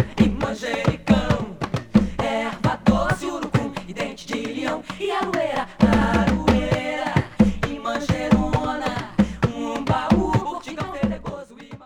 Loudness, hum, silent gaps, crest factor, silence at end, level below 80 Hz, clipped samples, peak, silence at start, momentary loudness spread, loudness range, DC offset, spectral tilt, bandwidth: -22 LUFS; none; none; 20 dB; 0 s; -36 dBFS; under 0.1%; -2 dBFS; 0 s; 9 LU; 3 LU; under 0.1%; -6.5 dB/octave; 12 kHz